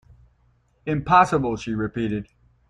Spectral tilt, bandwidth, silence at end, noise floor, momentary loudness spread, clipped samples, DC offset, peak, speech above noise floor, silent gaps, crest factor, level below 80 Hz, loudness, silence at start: -6.5 dB/octave; 11.5 kHz; 0.45 s; -62 dBFS; 13 LU; under 0.1%; under 0.1%; -2 dBFS; 41 dB; none; 22 dB; -48 dBFS; -22 LUFS; 0.85 s